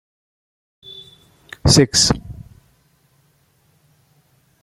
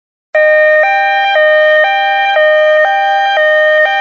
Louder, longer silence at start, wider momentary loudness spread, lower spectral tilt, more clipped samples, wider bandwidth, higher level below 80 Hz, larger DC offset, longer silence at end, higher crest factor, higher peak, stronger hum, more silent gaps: second, -15 LUFS vs -8 LUFS; first, 0.95 s vs 0.35 s; first, 27 LU vs 3 LU; first, -3.5 dB/octave vs 2 dB/octave; neither; first, 13.5 kHz vs 6.8 kHz; first, -38 dBFS vs -70 dBFS; neither; first, 2.3 s vs 0 s; first, 22 dB vs 8 dB; about the same, 0 dBFS vs -2 dBFS; neither; neither